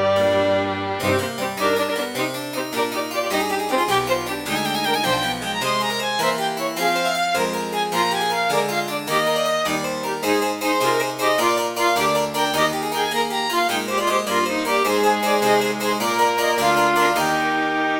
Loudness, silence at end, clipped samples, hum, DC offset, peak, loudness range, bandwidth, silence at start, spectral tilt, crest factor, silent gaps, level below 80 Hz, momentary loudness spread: -20 LUFS; 0 s; under 0.1%; none; under 0.1%; -6 dBFS; 3 LU; 17 kHz; 0 s; -3 dB/octave; 16 dB; none; -56 dBFS; 5 LU